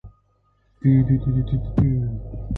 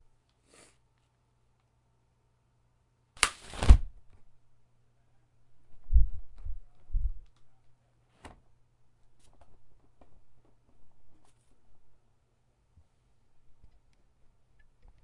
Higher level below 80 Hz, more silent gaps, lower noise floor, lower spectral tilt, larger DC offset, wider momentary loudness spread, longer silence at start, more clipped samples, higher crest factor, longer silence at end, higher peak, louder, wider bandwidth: about the same, -34 dBFS vs -34 dBFS; neither; second, -63 dBFS vs -71 dBFS; first, -11.5 dB/octave vs -4 dB/octave; neither; second, 9 LU vs 30 LU; second, 0.05 s vs 3.2 s; neither; second, 14 dB vs 32 dB; second, 0 s vs 1.5 s; second, -6 dBFS vs 0 dBFS; first, -21 LUFS vs -29 LUFS; second, 4 kHz vs 11.5 kHz